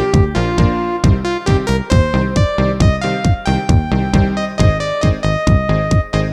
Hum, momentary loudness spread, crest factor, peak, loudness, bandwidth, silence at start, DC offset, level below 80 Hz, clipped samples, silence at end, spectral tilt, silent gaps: none; 2 LU; 14 dB; 0 dBFS; -15 LUFS; 11 kHz; 0 s; under 0.1%; -22 dBFS; under 0.1%; 0 s; -6.5 dB/octave; none